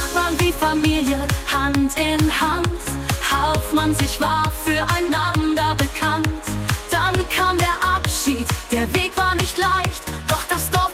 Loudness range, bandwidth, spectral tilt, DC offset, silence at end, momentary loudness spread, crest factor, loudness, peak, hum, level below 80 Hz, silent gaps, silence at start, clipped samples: 1 LU; 17.5 kHz; -4 dB/octave; under 0.1%; 0 s; 4 LU; 16 dB; -20 LUFS; -4 dBFS; none; -32 dBFS; none; 0 s; under 0.1%